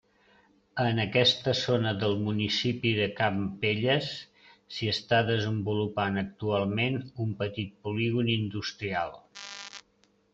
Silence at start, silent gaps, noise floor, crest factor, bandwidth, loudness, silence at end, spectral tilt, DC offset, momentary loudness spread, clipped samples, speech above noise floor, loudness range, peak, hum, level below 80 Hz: 0.75 s; none; -67 dBFS; 20 dB; 7.8 kHz; -28 LUFS; 0.55 s; -5.5 dB/octave; under 0.1%; 14 LU; under 0.1%; 39 dB; 4 LU; -8 dBFS; none; -64 dBFS